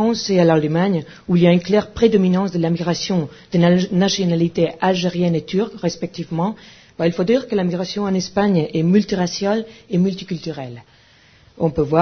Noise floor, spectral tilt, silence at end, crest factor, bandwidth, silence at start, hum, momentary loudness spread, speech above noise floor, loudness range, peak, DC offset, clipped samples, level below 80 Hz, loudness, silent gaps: -51 dBFS; -6.5 dB/octave; 0 s; 18 dB; 6.6 kHz; 0 s; none; 9 LU; 33 dB; 4 LU; 0 dBFS; under 0.1%; under 0.1%; -50 dBFS; -19 LUFS; none